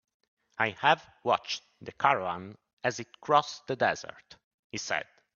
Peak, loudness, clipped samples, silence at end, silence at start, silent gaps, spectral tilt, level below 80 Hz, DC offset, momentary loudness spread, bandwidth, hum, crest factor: -6 dBFS; -30 LUFS; under 0.1%; 0.35 s; 0.6 s; 2.73-2.77 s, 4.44-4.70 s; -3.5 dB/octave; -74 dBFS; under 0.1%; 14 LU; 7.4 kHz; none; 24 dB